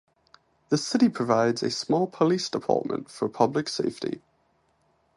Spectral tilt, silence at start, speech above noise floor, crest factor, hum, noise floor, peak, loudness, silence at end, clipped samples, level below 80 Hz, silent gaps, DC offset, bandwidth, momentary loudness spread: -5 dB/octave; 0.7 s; 43 dB; 22 dB; none; -68 dBFS; -6 dBFS; -26 LUFS; 1 s; under 0.1%; -68 dBFS; none; under 0.1%; 11.5 kHz; 9 LU